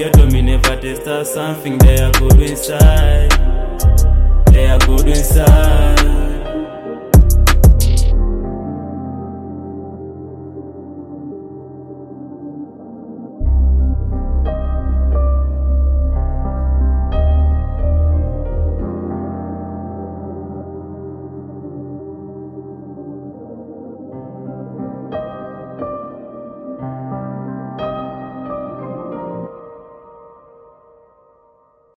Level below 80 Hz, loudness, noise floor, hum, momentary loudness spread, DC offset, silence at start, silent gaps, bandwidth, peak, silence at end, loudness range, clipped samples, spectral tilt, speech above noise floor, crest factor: -16 dBFS; -15 LUFS; -53 dBFS; none; 21 LU; under 0.1%; 0 s; none; 15.5 kHz; 0 dBFS; 2.2 s; 18 LU; under 0.1%; -6 dB/octave; 44 dB; 14 dB